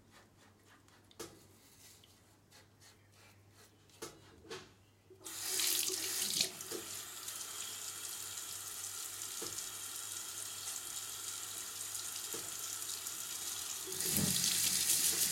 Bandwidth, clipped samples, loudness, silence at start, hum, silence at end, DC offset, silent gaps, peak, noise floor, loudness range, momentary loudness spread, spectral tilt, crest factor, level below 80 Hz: 16.5 kHz; under 0.1%; -37 LUFS; 0.1 s; none; 0 s; under 0.1%; none; -14 dBFS; -65 dBFS; 22 LU; 20 LU; -0.5 dB/octave; 28 dB; -76 dBFS